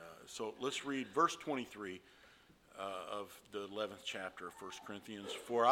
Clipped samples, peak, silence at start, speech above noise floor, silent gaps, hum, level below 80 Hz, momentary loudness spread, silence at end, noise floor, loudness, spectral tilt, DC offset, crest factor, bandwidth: under 0.1%; -16 dBFS; 0 s; 25 dB; none; none; -78 dBFS; 14 LU; 0 s; -65 dBFS; -42 LUFS; -3.5 dB/octave; under 0.1%; 24 dB; 17.5 kHz